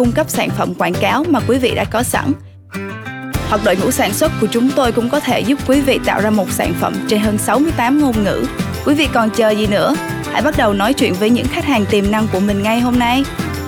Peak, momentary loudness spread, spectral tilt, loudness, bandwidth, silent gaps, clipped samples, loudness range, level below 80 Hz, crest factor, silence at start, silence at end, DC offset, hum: -2 dBFS; 6 LU; -5 dB/octave; -15 LUFS; over 20 kHz; none; under 0.1%; 2 LU; -34 dBFS; 12 dB; 0 s; 0 s; under 0.1%; none